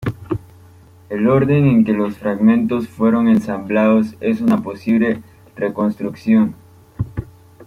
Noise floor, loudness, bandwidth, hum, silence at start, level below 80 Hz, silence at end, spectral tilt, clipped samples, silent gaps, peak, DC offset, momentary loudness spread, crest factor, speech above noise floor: -44 dBFS; -17 LUFS; 6.6 kHz; none; 0 s; -48 dBFS; 0.05 s; -9 dB/octave; under 0.1%; none; -2 dBFS; under 0.1%; 13 LU; 14 dB; 29 dB